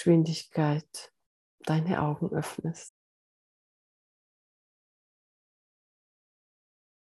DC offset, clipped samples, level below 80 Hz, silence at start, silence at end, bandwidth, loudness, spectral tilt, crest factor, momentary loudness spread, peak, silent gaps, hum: under 0.1%; under 0.1%; -70 dBFS; 0 s; 4.15 s; 12.5 kHz; -30 LUFS; -7 dB/octave; 22 dB; 18 LU; -10 dBFS; 1.26-1.58 s; none